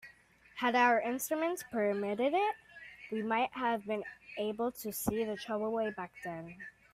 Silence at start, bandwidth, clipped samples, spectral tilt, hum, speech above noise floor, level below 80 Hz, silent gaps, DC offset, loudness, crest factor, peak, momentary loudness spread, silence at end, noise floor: 0.05 s; 16 kHz; under 0.1%; -4 dB/octave; none; 28 dB; -68 dBFS; none; under 0.1%; -34 LUFS; 20 dB; -14 dBFS; 16 LU; 0.25 s; -62 dBFS